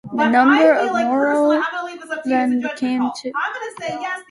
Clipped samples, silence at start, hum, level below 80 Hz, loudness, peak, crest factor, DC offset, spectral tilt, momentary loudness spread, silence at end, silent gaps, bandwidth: under 0.1%; 0.05 s; none; -66 dBFS; -18 LUFS; -2 dBFS; 16 dB; under 0.1%; -4.5 dB/octave; 14 LU; 0.1 s; none; 11.5 kHz